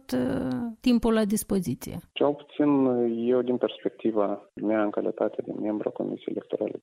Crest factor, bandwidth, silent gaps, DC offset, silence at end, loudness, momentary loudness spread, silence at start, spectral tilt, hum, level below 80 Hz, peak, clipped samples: 16 dB; 16 kHz; none; under 0.1%; 0.05 s; -27 LUFS; 9 LU; 0.1 s; -6 dB/octave; none; -54 dBFS; -10 dBFS; under 0.1%